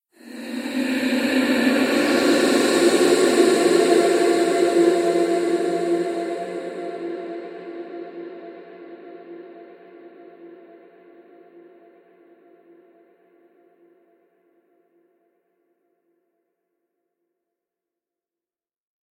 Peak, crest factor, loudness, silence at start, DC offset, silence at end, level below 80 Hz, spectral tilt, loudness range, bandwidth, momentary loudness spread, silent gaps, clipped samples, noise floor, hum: -4 dBFS; 20 dB; -19 LUFS; 0.25 s; under 0.1%; 8.55 s; -70 dBFS; -3.5 dB/octave; 22 LU; 16 kHz; 24 LU; none; under 0.1%; under -90 dBFS; none